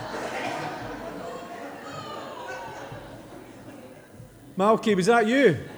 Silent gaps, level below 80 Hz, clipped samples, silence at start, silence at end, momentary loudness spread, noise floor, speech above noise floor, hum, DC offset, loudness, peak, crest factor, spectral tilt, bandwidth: none; -60 dBFS; under 0.1%; 0 s; 0 s; 24 LU; -47 dBFS; 26 dB; none; under 0.1%; -25 LUFS; -6 dBFS; 20 dB; -5.5 dB/octave; over 20 kHz